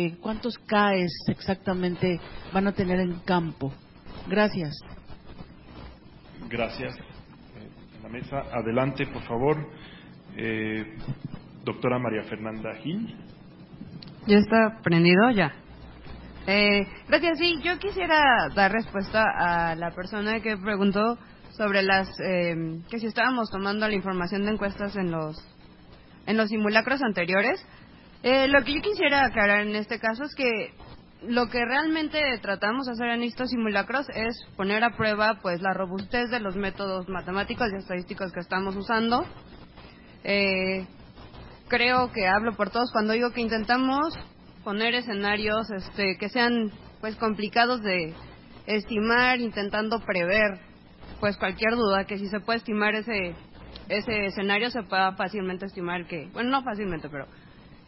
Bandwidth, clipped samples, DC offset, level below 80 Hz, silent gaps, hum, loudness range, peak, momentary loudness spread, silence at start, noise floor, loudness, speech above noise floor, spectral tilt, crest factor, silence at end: 5.8 kHz; under 0.1%; under 0.1%; -50 dBFS; none; none; 8 LU; -4 dBFS; 16 LU; 0 s; -50 dBFS; -26 LUFS; 24 dB; -9.5 dB/octave; 22 dB; 0.15 s